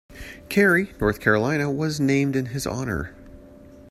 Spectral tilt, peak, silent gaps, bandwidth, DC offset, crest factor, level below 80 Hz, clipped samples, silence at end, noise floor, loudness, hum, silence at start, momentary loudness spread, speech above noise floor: -6 dB/octave; -4 dBFS; none; 14.5 kHz; under 0.1%; 20 dB; -44 dBFS; under 0.1%; 0.1 s; -46 dBFS; -22 LUFS; none; 0.1 s; 12 LU; 24 dB